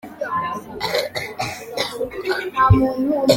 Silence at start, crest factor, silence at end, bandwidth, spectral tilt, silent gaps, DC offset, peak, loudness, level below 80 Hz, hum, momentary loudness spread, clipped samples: 0.05 s; 20 dB; 0 s; 17 kHz; -5.5 dB/octave; none; under 0.1%; -2 dBFS; -21 LUFS; -38 dBFS; none; 11 LU; under 0.1%